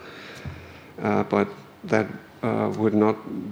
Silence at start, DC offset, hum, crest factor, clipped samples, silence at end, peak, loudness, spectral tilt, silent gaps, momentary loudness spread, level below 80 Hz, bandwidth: 0 s; under 0.1%; none; 22 dB; under 0.1%; 0 s; -4 dBFS; -25 LUFS; -7.5 dB/octave; none; 18 LU; -58 dBFS; over 20 kHz